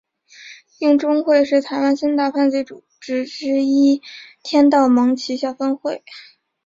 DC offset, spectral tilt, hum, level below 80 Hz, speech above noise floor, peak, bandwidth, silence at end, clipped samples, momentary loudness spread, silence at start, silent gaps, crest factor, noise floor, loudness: under 0.1%; -4 dB/octave; none; -64 dBFS; 26 dB; -2 dBFS; 7.6 kHz; 0.45 s; under 0.1%; 12 LU; 0.4 s; none; 16 dB; -43 dBFS; -17 LUFS